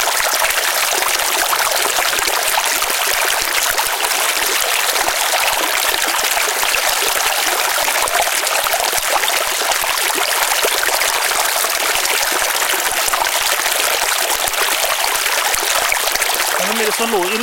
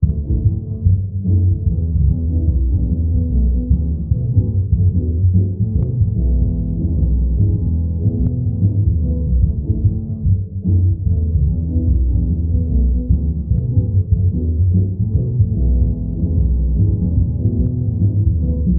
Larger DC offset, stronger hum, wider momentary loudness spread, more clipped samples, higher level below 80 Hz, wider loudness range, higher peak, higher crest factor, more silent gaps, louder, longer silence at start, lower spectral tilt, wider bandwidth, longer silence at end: neither; neither; about the same, 1 LU vs 3 LU; neither; second, -46 dBFS vs -20 dBFS; about the same, 0 LU vs 1 LU; about the same, 0 dBFS vs -2 dBFS; about the same, 16 dB vs 14 dB; neither; first, -14 LUFS vs -17 LUFS; about the same, 0 s vs 0 s; second, 1 dB/octave vs -19.5 dB/octave; first, 17.5 kHz vs 1 kHz; about the same, 0 s vs 0 s